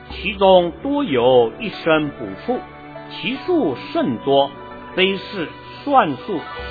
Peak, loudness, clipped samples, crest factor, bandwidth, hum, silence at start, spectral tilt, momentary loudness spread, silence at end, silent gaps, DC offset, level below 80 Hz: 0 dBFS; -19 LUFS; under 0.1%; 18 dB; 4.9 kHz; none; 0 s; -8 dB/octave; 14 LU; 0 s; none; under 0.1%; -46 dBFS